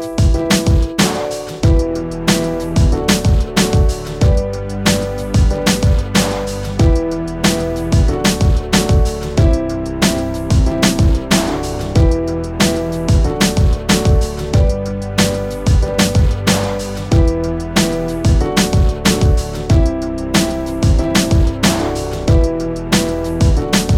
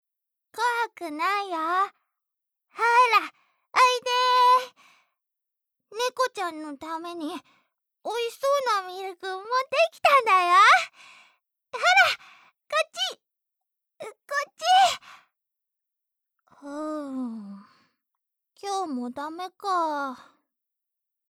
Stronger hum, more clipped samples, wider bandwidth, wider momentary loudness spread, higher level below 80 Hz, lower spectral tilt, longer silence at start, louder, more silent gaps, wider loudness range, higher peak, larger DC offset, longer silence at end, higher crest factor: neither; neither; about the same, 17 kHz vs 17 kHz; second, 5 LU vs 19 LU; first, -18 dBFS vs -80 dBFS; first, -5 dB/octave vs -1 dB/octave; second, 0 s vs 0.55 s; first, -15 LUFS vs -23 LUFS; neither; second, 1 LU vs 13 LU; first, 0 dBFS vs -8 dBFS; neither; second, 0 s vs 1.15 s; second, 14 dB vs 20 dB